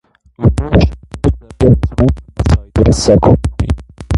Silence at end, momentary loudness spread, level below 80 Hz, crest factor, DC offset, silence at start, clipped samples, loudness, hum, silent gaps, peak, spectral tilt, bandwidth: 0 s; 9 LU; -18 dBFS; 12 dB; under 0.1%; 0.4 s; under 0.1%; -13 LUFS; none; none; 0 dBFS; -7 dB/octave; 11.5 kHz